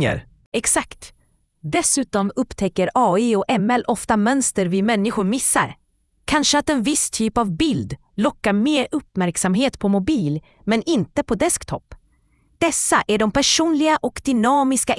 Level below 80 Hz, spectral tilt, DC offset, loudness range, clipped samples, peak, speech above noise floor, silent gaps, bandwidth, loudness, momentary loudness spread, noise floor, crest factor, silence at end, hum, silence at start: -46 dBFS; -3.5 dB/octave; under 0.1%; 2 LU; under 0.1%; -4 dBFS; 41 dB; 0.46-0.52 s; 12 kHz; -19 LUFS; 7 LU; -60 dBFS; 16 dB; 0 s; none; 0 s